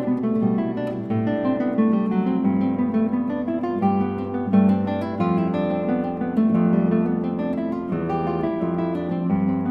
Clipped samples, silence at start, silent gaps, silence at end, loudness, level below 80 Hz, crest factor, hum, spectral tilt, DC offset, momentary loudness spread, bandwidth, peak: under 0.1%; 0 s; none; 0 s; -22 LUFS; -54 dBFS; 14 dB; none; -10.5 dB/octave; under 0.1%; 6 LU; 5 kHz; -6 dBFS